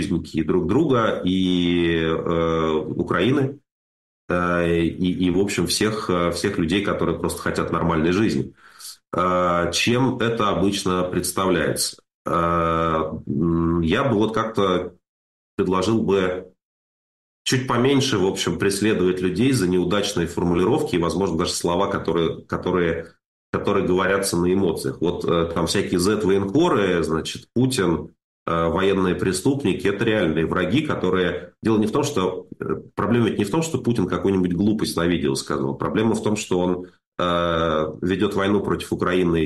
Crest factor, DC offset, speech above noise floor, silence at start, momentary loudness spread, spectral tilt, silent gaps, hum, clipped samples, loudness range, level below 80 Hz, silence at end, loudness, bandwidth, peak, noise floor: 12 dB; under 0.1%; over 69 dB; 0 s; 6 LU; -5.5 dB/octave; 3.71-4.28 s, 12.14-12.25 s, 15.09-15.58 s, 16.65-17.45 s, 23.26-23.53 s, 28.24-28.46 s, 37.07-37.12 s; none; under 0.1%; 2 LU; -46 dBFS; 0 s; -21 LUFS; 12.5 kHz; -10 dBFS; under -90 dBFS